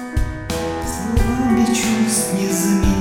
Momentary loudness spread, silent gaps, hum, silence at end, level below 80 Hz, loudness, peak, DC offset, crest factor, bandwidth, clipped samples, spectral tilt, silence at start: 8 LU; none; none; 0 s; -26 dBFS; -18 LUFS; -4 dBFS; under 0.1%; 14 dB; 18 kHz; under 0.1%; -4.5 dB/octave; 0 s